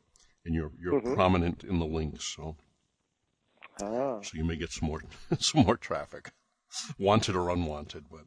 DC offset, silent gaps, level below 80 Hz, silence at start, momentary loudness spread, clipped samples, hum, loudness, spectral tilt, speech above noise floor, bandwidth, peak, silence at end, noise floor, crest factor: under 0.1%; none; -48 dBFS; 0.45 s; 16 LU; under 0.1%; none; -30 LUFS; -5 dB/octave; 49 dB; 10.5 kHz; -8 dBFS; 0.05 s; -79 dBFS; 22 dB